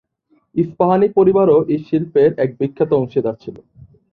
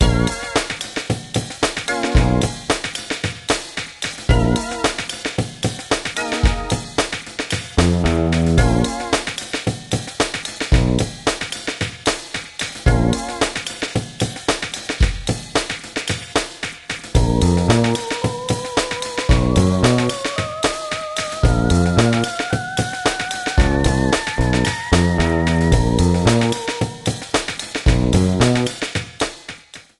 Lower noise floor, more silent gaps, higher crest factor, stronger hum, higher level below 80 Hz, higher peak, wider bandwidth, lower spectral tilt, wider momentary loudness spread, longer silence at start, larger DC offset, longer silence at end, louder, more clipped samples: first, -61 dBFS vs -38 dBFS; neither; about the same, 14 dB vs 18 dB; neither; second, -54 dBFS vs -26 dBFS; about the same, -2 dBFS vs 0 dBFS; second, 4.8 kHz vs 12.5 kHz; first, -11 dB/octave vs -5 dB/octave; about the same, 11 LU vs 9 LU; first, 0.55 s vs 0 s; neither; first, 0.6 s vs 0.2 s; first, -16 LUFS vs -19 LUFS; neither